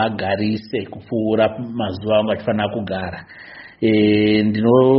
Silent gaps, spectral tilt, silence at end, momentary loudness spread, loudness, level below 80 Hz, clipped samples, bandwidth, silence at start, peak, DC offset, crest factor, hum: none; -5.5 dB/octave; 0 s; 14 LU; -19 LUFS; -52 dBFS; under 0.1%; 5.8 kHz; 0 s; -2 dBFS; under 0.1%; 16 dB; none